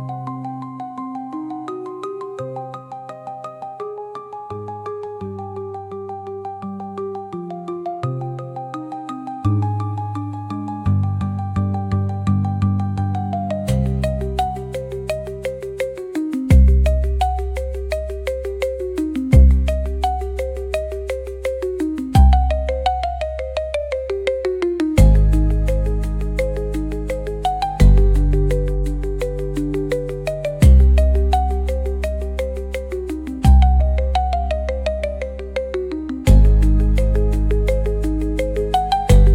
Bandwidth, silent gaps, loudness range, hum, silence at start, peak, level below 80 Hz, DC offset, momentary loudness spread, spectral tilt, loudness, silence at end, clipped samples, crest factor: 12 kHz; none; 11 LU; none; 0 s; -2 dBFS; -20 dBFS; under 0.1%; 16 LU; -7.5 dB/octave; -20 LUFS; 0 s; under 0.1%; 16 dB